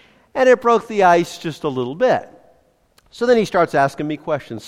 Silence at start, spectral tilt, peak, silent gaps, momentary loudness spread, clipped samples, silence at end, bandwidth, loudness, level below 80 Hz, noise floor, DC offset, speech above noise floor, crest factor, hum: 0.35 s; -5.5 dB/octave; -2 dBFS; none; 11 LU; under 0.1%; 0 s; 13.5 kHz; -17 LUFS; -56 dBFS; -57 dBFS; under 0.1%; 40 dB; 16 dB; none